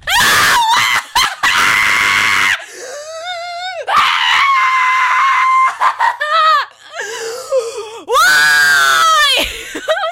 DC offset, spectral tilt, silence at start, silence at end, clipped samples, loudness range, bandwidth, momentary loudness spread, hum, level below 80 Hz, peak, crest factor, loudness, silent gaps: under 0.1%; 0.5 dB/octave; 0.05 s; 0 s; under 0.1%; 2 LU; 16.5 kHz; 15 LU; none; -46 dBFS; -2 dBFS; 12 dB; -11 LUFS; none